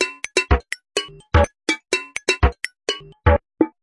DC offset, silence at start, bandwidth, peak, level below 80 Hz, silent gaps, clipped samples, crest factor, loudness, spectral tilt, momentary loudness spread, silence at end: under 0.1%; 0 s; 11.5 kHz; 0 dBFS; -28 dBFS; none; under 0.1%; 20 dB; -21 LUFS; -4.5 dB/octave; 7 LU; 0.15 s